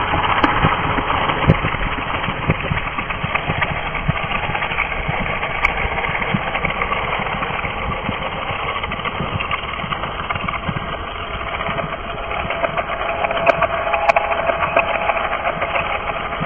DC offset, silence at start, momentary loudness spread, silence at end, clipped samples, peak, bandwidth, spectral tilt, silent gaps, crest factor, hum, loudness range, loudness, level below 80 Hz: 0.5%; 0 s; 7 LU; 0 s; under 0.1%; 0 dBFS; 8 kHz; -7 dB/octave; none; 20 dB; none; 5 LU; -20 LUFS; -32 dBFS